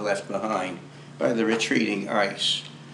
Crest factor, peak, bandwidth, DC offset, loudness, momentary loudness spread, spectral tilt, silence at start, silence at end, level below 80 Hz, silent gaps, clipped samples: 18 dB; -8 dBFS; 12 kHz; under 0.1%; -25 LUFS; 9 LU; -3.5 dB/octave; 0 s; 0 s; -78 dBFS; none; under 0.1%